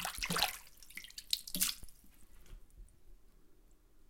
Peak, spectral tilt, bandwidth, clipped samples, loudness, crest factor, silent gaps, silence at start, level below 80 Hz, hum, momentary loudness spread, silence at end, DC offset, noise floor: -12 dBFS; -1 dB/octave; 17 kHz; under 0.1%; -36 LUFS; 30 dB; none; 0 s; -58 dBFS; none; 16 LU; 0.05 s; under 0.1%; -62 dBFS